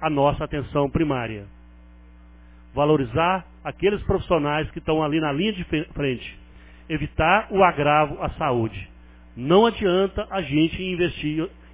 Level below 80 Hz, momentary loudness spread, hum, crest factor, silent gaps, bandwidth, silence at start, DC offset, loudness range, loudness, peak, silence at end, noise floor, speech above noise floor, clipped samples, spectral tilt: -40 dBFS; 12 LU; 60 Hz at -45 dBFS; 20 dB; none; 4 kHz; 0 s; under 0.1%; 4 LU; -22 LUFS; -4 dBFS; 0.2 s; -47 dBFS; 25 dB; under 0.1%; -10.5 dB/octave